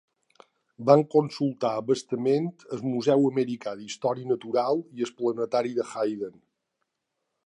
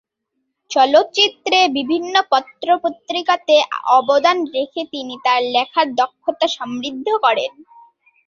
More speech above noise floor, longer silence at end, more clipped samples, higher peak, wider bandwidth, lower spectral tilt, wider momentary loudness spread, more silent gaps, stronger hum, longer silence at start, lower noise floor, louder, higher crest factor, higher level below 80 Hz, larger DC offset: about the same, 56 dB vs 57 dB; first, 1.15 s vs 0.65 s; neither; about the same, -4 dBFS vs -2 dBFS; first, 11 kHz vs 7.6 kHz; first, -6.5 dB/octave vs -2 dB/octave; about the same, 12 LU vs 10 LU; neither; neither; about the same, 0.8 s vs 0.7 s; first, -81 dBFS vs -74 dBFS; second, -26 LUFS vs -17 LUFS; first, 22 dB vs 16 dB; second, -78 dBFS vs -68 dBFS; neither